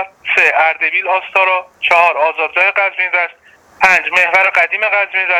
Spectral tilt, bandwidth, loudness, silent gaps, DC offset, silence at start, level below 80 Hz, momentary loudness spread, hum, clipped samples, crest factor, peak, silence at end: -1 dB/octave; 16 kHz; -12 LUFS; none; under 0.1%; 0 s; -58 dBFS; 5 LU; none; under 0.1%; 14 dB; 0 dBFS; 0 s